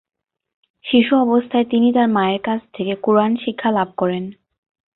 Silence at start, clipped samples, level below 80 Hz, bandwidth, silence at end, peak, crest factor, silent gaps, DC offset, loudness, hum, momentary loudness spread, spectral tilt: 0.85 s; under 0.1%; -60 dBFS; 4.1 kHz; 0.65 s; -2 dBFS; 16 dB; none; under 0.1%; -18 LUFS; none; 9 LU; -11 dB/octave